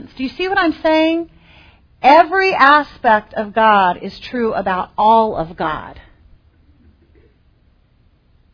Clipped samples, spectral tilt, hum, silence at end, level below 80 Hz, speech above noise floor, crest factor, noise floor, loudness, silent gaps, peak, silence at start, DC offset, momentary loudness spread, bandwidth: under 0.1%; -6 dB/octave; none; 2.55 s; -46 dBFS; 40 dB; 16 dB; -54 dBFS; -15 LUFS; none; 0 dBFS; 0 s; under 0.1%; 12 LU; 5.4 kHz